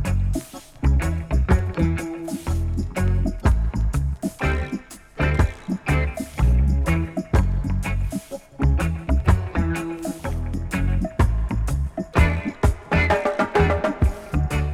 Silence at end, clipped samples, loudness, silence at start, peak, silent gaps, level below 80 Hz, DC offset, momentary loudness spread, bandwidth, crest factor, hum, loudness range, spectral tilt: 0 s; under 0.1%; -23 LUFS; 0 s; -4 dBFS; none; -24 dBFS; under 0.1%; 8 LU; 14 kHz; 18 dB; none; 3 LU; -7 dB/octave